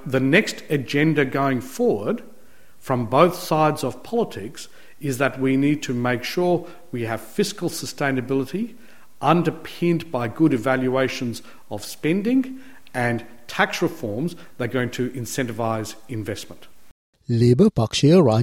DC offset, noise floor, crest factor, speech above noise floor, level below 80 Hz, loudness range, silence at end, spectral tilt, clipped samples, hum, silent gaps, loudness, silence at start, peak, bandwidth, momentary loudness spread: 1%; -54 dBFS; 20 dB; 32 dB; -56 dBFS; 4 LU; 0 s; -6 dB/octave; under 0.1%; none; 16.91-17.13 s; -22 LUFS; 0 s; -2 dBFS; 17 kHz; 14 LU